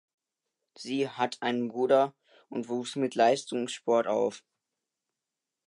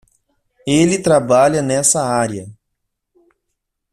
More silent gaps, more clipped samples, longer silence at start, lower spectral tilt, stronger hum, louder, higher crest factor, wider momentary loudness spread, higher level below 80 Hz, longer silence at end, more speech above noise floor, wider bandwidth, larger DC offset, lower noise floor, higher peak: neither; neither; first, 0.8 s vs 0.65 s; about the same, -4.5 dB/octave vs -4.5 dB/octave; neither; second, -29 LUFS vs -14 LUFS; about the same, 20 dB vs 16 dB; about the same, 10 LU vs 10 LU; second, -84 dBFS vs -52 dBFS; about the same, 1.3 s vs 1.4 s; about the same, 60 dB vs 60 dB; second, 11 kHz vs 14.5 kHz; neither; first, -88 dBFS vs -75 dBFS; second, -10 dBFS vs 0 dBFS